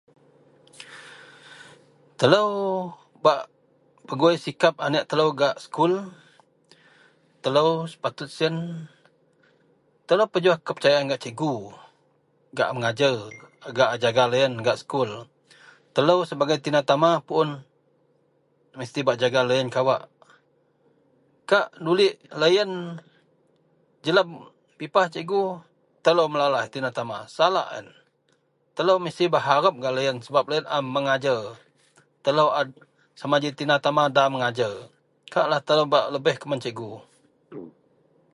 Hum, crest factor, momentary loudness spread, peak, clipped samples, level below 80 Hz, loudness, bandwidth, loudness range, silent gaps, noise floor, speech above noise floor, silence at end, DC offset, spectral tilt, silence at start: none; 24 dB; 17 LU; -2 dBFS; under 0.1%; -72 dBFS; -23 LUFS; 11.5 kHz; 3 LU; none; -67 dBFS; 45 dB; 0.65 s; under 0.1%; -5 dB/octave; 0.8 s